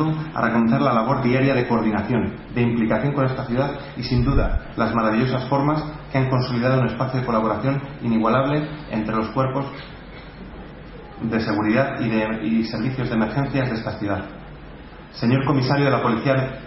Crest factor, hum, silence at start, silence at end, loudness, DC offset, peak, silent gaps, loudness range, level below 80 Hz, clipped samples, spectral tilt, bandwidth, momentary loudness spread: 16 dB; none; 0 s; 0 s; -21 LUFS; under 0.1%; -4 dBFS; none; 4 LU; -36 dBFS; under 0.1%; -10.5 dB/octave; 5.8 kHz; 19 LU